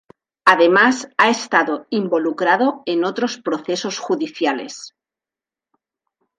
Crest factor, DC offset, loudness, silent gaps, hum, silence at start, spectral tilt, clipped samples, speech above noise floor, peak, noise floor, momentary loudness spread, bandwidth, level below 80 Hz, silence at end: 20 dB; under 0.1%; -18 LUFS; none; none; 0.45 s; -3.5 dB/octave; under 0.1%; 72 dB; 0 dBFS; -89 dBFS; 10 LU; 11 kHz; -70 dBFS; 1.5 s